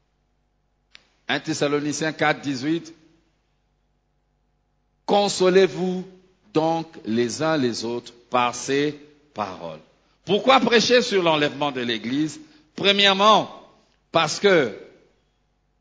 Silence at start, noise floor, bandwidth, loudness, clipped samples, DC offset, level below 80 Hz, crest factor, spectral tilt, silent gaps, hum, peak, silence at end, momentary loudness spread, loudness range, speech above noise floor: 1.3 s; -68 dBFS; 8 kHz; -21 LUFS; under 0.1%; under 0.1%; -64 dBFS; 20 dB; -4 dB/octave; none; none; -2 dBFS; 0.95 s; 17 LU; 7 LU; 47 dB